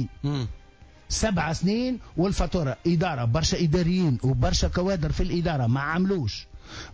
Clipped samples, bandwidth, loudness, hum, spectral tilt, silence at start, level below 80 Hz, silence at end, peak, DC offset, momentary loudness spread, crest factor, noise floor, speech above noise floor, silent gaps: under 0.1%; 8 kHz; -25 LUFS; none; -5.5 dB/octave; 0 s; -36 dBFS; 0 s; -12 dBFS; under 0.1%; 7 LU; 14 dB; -51 dBFS; 27 dB; none